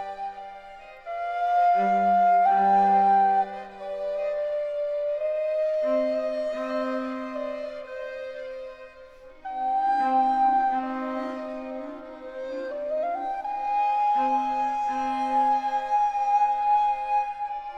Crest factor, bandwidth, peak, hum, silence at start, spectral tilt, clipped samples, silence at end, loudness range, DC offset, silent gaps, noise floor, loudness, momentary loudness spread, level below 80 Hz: 12 dB; 7.8 kHz; -12 dBFS; none; 0 s; -6 dB/octave; under 0.1%; 0 s; 8 LU; under 0.1%; none; -47 dBFS; -25 LUFS; 17 LU; -60 dBFS